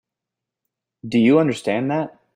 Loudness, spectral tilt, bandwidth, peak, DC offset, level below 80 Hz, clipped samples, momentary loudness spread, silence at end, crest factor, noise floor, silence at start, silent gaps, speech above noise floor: -19 LUFS; -7 dB/octave; 11 kHz; -4 dBFS; under 0.1%; -64 dBFS; under 0.1%; 10 LU; 0.25 s; 18 dB; -85 dBFS; 1.05 s; none; 67 dB